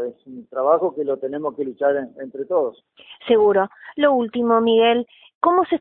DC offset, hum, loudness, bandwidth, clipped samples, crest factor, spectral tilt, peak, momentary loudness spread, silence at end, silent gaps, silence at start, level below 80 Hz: under 0.1%; none; -20 LUFS; 4 kHz; under 0.1%; 16 dB; -9.5 dB/octave; -4 dBFS; 15 LU; 0 s; 5.35-5.41 s; 0 s; -66 dBFS